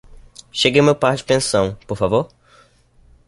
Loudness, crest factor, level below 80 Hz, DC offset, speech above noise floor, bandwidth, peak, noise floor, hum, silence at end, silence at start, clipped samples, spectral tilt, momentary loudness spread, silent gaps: -17 LUFS; 18 dB; -46 dBFS; under 0.1%; 35 dB; 11.5 kHz; -2 dBFS; -52 dBFS; none; 1 s; 0.55 s; under 0.1%; -4.5 dB/octave; 9 LU; none